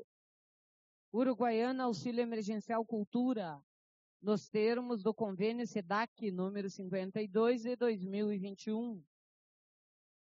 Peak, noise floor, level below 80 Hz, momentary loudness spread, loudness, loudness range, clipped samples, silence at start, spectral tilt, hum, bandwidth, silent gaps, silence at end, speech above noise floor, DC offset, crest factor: -20 dBFS; under -90 dBFS; -88 dBFS; 7 LU; -37 LUFS; 1 LU; under 0.1%; 0 s; -5.5 dB/octave; none; 7.4 kHz; 0.04-1.12 s, 3.07-3.12 s, 3.63-4.20 s, 6.08-6.16 s; 1.25 s; over 54 dB; under 0.1%; 16 dB